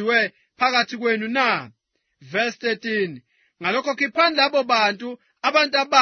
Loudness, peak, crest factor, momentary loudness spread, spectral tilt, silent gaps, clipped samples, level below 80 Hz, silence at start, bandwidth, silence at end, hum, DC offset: -21 LUFS; -2 dBFS; 20 dB; 9 LU; -3 dB/octave; none; under 0.1%; -74 dBFS; 0 s; 6.6 kHz; 0 s; none; under 0.1%